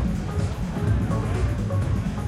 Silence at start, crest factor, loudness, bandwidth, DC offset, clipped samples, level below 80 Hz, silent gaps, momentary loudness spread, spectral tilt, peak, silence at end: 0 s; 12 dB; -25 LUFS; 13 kHz; under 0.1%; under 0.1%; -30 dBFS; none; 3 LU; -7.5 dB/octave; -12 dBFS; 0 s